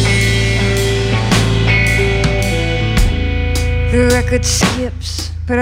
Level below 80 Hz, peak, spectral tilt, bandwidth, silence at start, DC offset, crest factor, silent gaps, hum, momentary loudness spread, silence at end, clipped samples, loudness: -20 dBFS; 0 dBFS; -4.5 dB/octave; 16.5 kHz; 0 s; under 0.1%; 12 dB; none; none; 6 LU; 0 s; under 0.1%; -14 LUFS